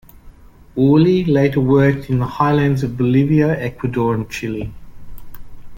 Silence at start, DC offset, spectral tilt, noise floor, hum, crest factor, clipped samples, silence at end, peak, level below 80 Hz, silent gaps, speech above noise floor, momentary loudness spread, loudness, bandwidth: 0.25 s; under 0.1%; -8.5 dB/octave; -41 dBFS; none; 14 dB; under 0.1%; 0 s; -2 dBFS; -40 dBFS; none; 26 dB; 11 LU; -16 LUFS; 17 kHz